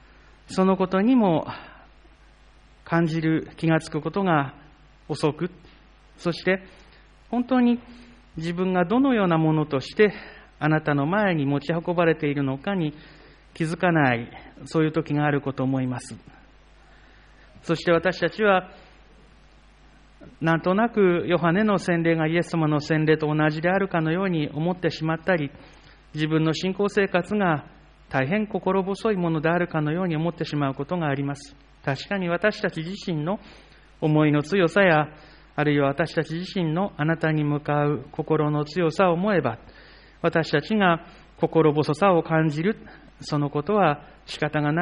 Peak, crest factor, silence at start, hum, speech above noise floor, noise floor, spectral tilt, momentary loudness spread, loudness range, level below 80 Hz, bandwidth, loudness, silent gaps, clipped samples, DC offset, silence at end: -6 dBFS; 18 dB; 0.5 s; none; 30 dB; -53 dBFS; -7 dB/octave; 10 LU; 4 LU; -54 dBFS; 10 kHz; -23 LUFS; none; under 0.1%; under 0.1%; 0 s